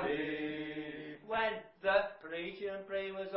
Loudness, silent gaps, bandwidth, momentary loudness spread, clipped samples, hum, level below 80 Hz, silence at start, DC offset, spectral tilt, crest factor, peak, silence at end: -37 LUFS; none; 5.6 kHz; 10 LU; under 0.1%; none; -68 dBFS; 0 s; under 0.1%; -2 dB/octave; 20 dB; -18 dBFS; 0 s